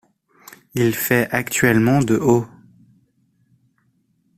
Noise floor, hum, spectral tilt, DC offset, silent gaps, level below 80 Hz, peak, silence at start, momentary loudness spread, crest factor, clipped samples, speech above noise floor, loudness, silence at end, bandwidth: -64 dBFS; none; -5.5 dB/octave; under 0.1%; none; -52 dBFS; -2 dBFS; 0.75 s; 5 LU; 18 dB; under 0.1%; 47 dB; -18 LUFS; 1.9 s; 16 kHz